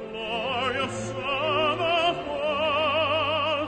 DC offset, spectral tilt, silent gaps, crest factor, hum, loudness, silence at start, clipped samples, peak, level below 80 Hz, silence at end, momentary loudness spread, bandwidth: under 0.1%; -4 dB/octave; none; 14 dB; none; -25 LUFS; 0 s; under 0.1%; -12 dBFS; -54 dBFS; 0 s; 6 LU; 9.4 kHz